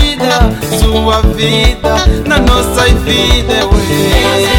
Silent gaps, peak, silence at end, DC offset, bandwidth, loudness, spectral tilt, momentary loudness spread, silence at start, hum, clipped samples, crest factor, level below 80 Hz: none; 0 dBFS; 0 s; under 0.1%; 17 kHz; -10 LUFS; -4.5 dB/octave; 2 LU; 0 s; none; 0.8%; 8 dB; -14 dBFS